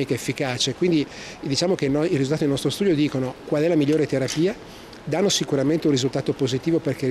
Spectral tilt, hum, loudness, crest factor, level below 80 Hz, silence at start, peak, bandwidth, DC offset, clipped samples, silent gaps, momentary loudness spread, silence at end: -5 dB/octave; none; -22 LUFS; 12 dB; -52 dBFS; 0 s; -10 dBFS; 14 kHz; under 0.1%; under 0.1%; none; 6 LU; 0 s